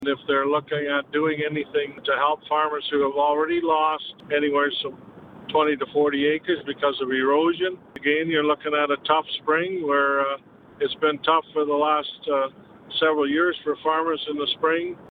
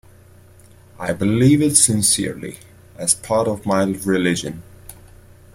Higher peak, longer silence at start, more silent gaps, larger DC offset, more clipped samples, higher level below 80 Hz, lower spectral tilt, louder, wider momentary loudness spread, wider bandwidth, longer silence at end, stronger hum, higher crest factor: second, -6 dBFS vs 0 dBFS; second, 0 s vs 1 s; neither; neither; neither; second, -66 dBFS vs -50 dBFS; first, -7 dB/octave vs -4 dB/octave; second, -23 LUFS vs -17 LUFS; second, 6 LU vs 17 LU; second, 4.7 kHz vs 16.5 kHz; second, 0 s vs 0.6 s; neither; about the same, 18 dB vs 20 dB